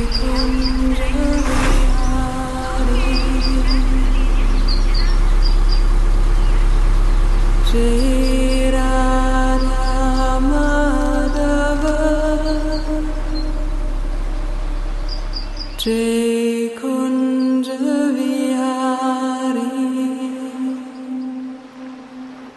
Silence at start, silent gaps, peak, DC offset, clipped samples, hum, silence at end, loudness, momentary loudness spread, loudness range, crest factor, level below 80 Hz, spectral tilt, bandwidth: 0 s; none; -4 dBFS; under 0.1%; under 0.1%; none; 0.05 s; -19 LUFS; 9 LU; 5 LU; 12 dB; -18 dBFS; -5.5 dB/octave; 12 kHz